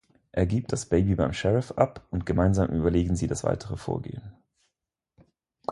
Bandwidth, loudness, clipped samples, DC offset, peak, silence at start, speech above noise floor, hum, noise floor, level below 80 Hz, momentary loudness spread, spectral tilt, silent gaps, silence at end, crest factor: 11.5 kHz; -26 LUFS; under 0.1%; under 0.1%; -6 dBFS; 0.35 s; 59 dB; none; -84 dBFS; -40 dBFS; 10 LU; -7 dB/octave; none; 0 s; 22 dB